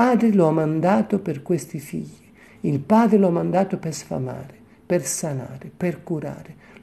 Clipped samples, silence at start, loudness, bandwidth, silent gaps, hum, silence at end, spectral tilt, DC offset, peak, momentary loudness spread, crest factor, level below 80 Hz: under 0.1%; 0 s; -22 LUFS; 13.5 kHz; none; none; 0.3 s; -6.5 dB/octave; under 0.1%; -6 dBFS; 16 LU; 16 dB; -60 dBFS